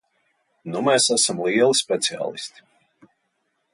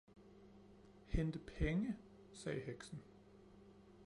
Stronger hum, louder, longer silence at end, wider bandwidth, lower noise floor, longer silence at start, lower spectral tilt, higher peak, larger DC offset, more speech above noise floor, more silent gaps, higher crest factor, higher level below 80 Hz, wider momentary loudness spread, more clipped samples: neither; first, -20 LUFS vs -45 LUFS; first, 1.25 s vs 0 s; about the same, 11.5 kHz vs 11 kHz; first, -72 dBFS vs -63 dBFS; first, 0.65 s vs 0.15 s; second, -2 dB/octave vs -7 dB/octave; first, -6 dBFS vs -26 dBFS; neither; first, 51 dB vs 21 dB; neither; about the same, 16 dB vs 20 dB; second, -70 dBFS vs -52 dBFS; second, 17 LU vs 23 LU; neither